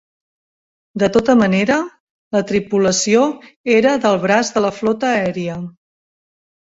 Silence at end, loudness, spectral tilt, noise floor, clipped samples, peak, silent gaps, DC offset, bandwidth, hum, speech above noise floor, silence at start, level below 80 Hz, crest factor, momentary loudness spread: 1.05 s; -16 LUFS; -4.5 dB/octave; under -90 dBFS; under 0.1%; -2 dBFS; 2.00-2.31 s, 3.56-3.64 s; under 0.1%; 8 kHz; none; over 74 dB; 0.95 s; -52 dBFS; 16 dB; 12 LU